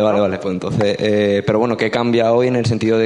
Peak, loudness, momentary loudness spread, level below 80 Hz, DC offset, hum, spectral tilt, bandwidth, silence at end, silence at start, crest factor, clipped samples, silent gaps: -2 dBFS; -16 LUFS; 4 LU; -52 dBFS; under 0.1%; none; -6.5 dB/octave; 10.5 kHz; 0 s; 0 s; 14 dB; under 0.1%; none